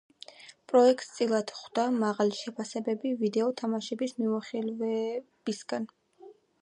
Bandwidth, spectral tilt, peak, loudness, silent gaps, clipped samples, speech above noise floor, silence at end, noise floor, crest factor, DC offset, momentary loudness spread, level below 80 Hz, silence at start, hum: 10.5 kHz; -5 dB/octave; -10 dBFS; -30 LUFS; none; under 0.1%; 26 dB; 0.3 s; -54 dBFS; 20 dB; under 0.1%; 12 LU; -84 dBFS; 0.4 s; none